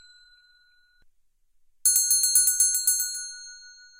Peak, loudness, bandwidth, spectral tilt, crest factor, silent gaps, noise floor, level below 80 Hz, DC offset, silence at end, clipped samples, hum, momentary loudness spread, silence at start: -6 dBFS; -20 LUFS; 16.5 kHz; 6 dB/octave; 22 dB; none; -63 dBFS; -68 dBFS; under 0.1%; 0.3 s; under 0.1%; none; 19 LU; 1.85 s